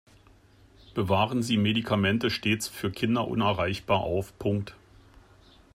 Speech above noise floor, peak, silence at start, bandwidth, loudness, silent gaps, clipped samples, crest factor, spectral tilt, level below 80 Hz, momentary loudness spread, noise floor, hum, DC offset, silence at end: 30 dB; -12 dBFS; 0.9 s; 16 kHz; -27 LUFS; none; under 0.1%; 16 dB; -5.5 dB/octave; -56 dBFS; 7 LU; -57 dBFS; none; under 0.1%; 1 s